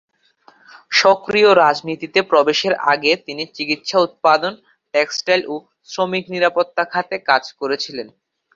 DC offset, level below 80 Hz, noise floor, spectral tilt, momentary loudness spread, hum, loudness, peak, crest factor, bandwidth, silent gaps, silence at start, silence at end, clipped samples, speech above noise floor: under 0.1%; -64 dBFS; -53 dBFS; -3.5 dB/octave; 12 LU; none; -17 LUFS; 0 dBFS; 18 dB; 7.6 kHz; none; 0.9 s; 0.5 s; under 0.1%; 36 dB